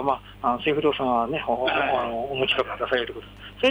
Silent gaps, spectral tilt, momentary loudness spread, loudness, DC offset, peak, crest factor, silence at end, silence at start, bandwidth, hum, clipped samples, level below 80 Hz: none; -5.5 dB/octave; 5 LU; -24 LUFS; under 0.1%; -10 dBFS; 16 dB; 0 s; 0 s; over 20 kHz; 50 Hz at -45 dBFS; under 0.1%; -50 dBFS